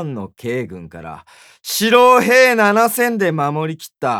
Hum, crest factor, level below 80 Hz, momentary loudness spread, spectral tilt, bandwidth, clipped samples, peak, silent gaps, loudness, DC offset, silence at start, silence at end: none; 16 dB; -58 dBFS; 23 LU; -4 dB/octave; 20 kHz; under 0.1%; 0 dBFS; none; -14 LUFS; under 0.1%; 0 s; 0 s